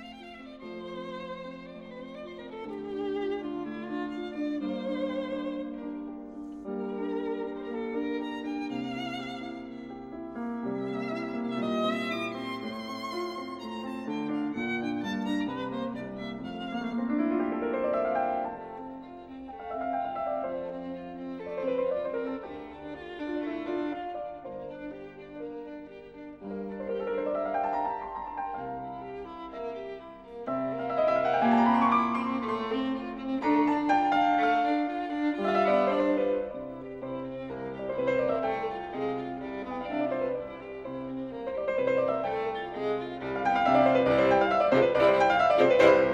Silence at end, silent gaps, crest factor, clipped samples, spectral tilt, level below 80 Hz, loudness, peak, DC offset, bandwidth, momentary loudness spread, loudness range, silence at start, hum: 0 s; none; 22 dB; under 0.1%; -6.5 dB/octave; -60 dBFS; -30 LUFS; -8 dBFS; under 0.1%; 9.2 kHz; 18 LU; 10 LU; 0 s; none